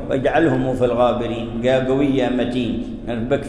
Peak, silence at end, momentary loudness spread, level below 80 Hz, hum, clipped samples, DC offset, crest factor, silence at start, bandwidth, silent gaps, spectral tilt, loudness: -4 dBFS; 0 s; 8 LU; -38 dBFS; none; under 0.1%; under 0.1%; 14 dB; 0 s; 11 kHz; none; -7.5 dB/octave; -19 LUFS